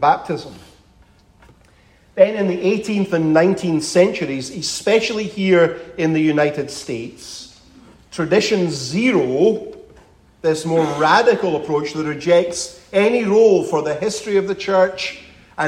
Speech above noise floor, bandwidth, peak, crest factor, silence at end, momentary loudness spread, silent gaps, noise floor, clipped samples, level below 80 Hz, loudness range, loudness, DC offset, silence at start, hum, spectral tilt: 35 dB; 15 kHz; 0 dBFS; 18 dB; 0 s; 13 LU; none; -52 dBFS; under 0.1%; -54 dBFS; 3 LU; -18 LUFS; under 0.1%; 0 s; none; -5 dB/octave